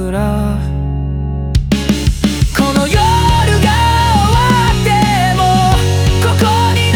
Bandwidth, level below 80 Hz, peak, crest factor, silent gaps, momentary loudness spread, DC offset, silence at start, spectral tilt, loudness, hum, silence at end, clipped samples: over 20 kHz; -20 dBFS; 0 dBFS; 10 dB; none; 7 LU; under 0.1%; 0 s; -5.5 dB/octave; -12 LUFS; none; 0 s; under 0.1%